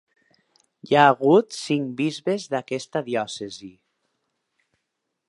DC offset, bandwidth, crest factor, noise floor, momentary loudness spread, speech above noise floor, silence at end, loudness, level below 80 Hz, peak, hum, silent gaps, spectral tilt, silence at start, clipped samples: under 0.1%; 11.5 kHz; 22 dB; -79 dBFS; 15 LU; 57 dB; 1.6 s; -22 LUFS; -72 dBFS; -2 dBFS; none; none; -5 dB/octave; 0.85 s; under 0.1%